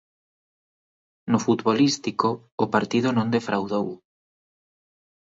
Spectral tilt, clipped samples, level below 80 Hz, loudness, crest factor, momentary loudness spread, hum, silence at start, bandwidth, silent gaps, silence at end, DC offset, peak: -5.5 dB/octave; under 0.1%; -66 dBFS; -23 LUFS; 20 dB; 7 LU; none; 1.25 s; 7.8 kHz; 2.52-2.58 s; 1.25 s; under 0.1%; -6 dBFS